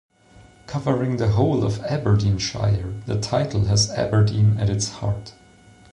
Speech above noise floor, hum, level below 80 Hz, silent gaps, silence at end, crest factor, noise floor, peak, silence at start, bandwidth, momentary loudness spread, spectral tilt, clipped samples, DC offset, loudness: 30 dB; none; -40 dBFS; none; 0.6 s; 14 dB; -50 dBFS; -8 dBFS; 0.7 s; 10.5 kHz; 8 LU; -5.5 dB/octave; under 0.1%; under 0.1%; -22 LUFS